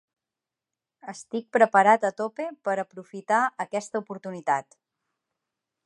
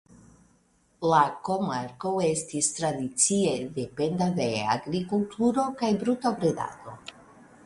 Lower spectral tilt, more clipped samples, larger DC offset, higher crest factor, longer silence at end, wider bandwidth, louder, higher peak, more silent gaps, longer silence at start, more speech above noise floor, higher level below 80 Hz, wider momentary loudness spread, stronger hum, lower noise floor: about the same, -5 dB/octave vs -4.5 dB/octave; neither; neither; about the same, 22 dB vs 20 dB; first, 1.25 s vs 0.55 s; about the same, 11.5 kHz vs 11.5 kHz; about the same, -25 LUFS vs -27 LUFS; first, -4 dBFS vs -8 dBFS; neither; about the same, 1.05 s vs 1 s; first, 64 dB vs 38 dB; second, -84 dBFS vs -62 dBFS; first, 19 LU vs 10 LU; neither; first, -89 dBFS vs -65 dBFS